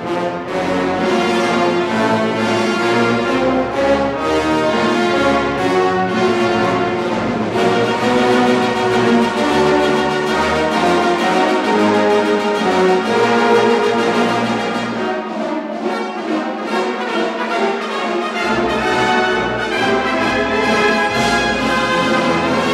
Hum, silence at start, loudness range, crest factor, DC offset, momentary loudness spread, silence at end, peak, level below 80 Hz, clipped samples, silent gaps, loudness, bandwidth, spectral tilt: none; 0 s; 4 LU; 14 dB; under 0.1%; 6 LU; 0 s; -2 dBFS; -44 dBFS; under 0.1%; none; -16 LUFS; 13.5 kHz; -5 dB/octave